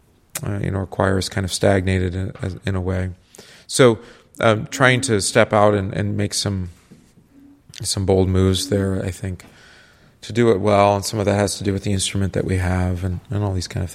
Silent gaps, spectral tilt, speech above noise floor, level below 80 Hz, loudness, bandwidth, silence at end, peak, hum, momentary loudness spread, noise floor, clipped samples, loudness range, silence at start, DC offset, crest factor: none; -5 dB/octave; 31 dB; -44 dBFS; -20 LUFS; 15 kHz; 0 s; 0 dBFS; none; 12 LU; -50 dBFS; under 0.1%; 4 LU; 0.35 s; under 0.1%; 20 dB